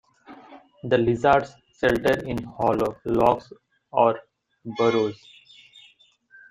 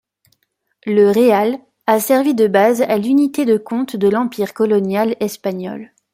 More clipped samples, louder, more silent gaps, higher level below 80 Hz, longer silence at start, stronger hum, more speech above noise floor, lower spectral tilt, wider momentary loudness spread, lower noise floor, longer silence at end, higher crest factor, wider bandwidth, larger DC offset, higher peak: neither; second, -23 LUFS vs -16 LUFS; neither; first, -52 dBFS vs -62 dBFS; second, 0.3 s vs 0.85 s; neither; second, 35 dB vs 49 dB; about the same, -6.5 dB/octave vs -5.5 dB/octave; first, 16 LU vs 11 LU; second, -57 dBFS vs -64 dBFS; first, 1.35 s vs 0.3 s; first, 20 dB vs 14 dB; about the same, 16 kHz vs 16.5 kHz; neither; about the same, -4 dBFS vs -2 dBFS